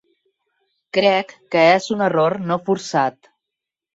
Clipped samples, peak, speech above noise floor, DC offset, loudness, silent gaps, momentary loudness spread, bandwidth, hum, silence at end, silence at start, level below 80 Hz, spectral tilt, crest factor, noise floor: under 0.1%; -2 dBFS; 66 dB; under 0.1%; -18 LUFS; none; 8 LU; 8 kHz; none; 0.85 s; 0.95 s; -66 dBFS; -5 dB/octave; 18 dB; -84 dBFS